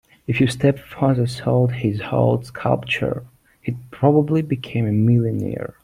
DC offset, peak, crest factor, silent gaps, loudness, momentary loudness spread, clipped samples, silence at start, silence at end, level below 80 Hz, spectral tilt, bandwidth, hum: under 0.1%; -2 dBFS; 18 dB; none; -20 LUFS; 10 LU; under 0.1%; 0.3 s; 0.15 s; -50 dBFS; -7.5 dB/octave; 12.5 kHz; none